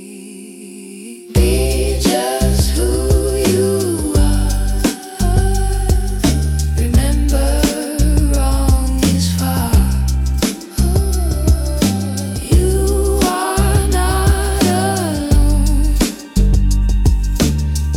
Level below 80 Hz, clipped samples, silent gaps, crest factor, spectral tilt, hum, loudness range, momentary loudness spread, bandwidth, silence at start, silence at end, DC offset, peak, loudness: -16 dBFS; under 0.1%; none; 12 dB; -5.5 dB/octave; none; 1 LU; 5 LU; 16.5 kHz; 0 s; 0 s; under 0.1%; -2 dBFS; -16 LUFS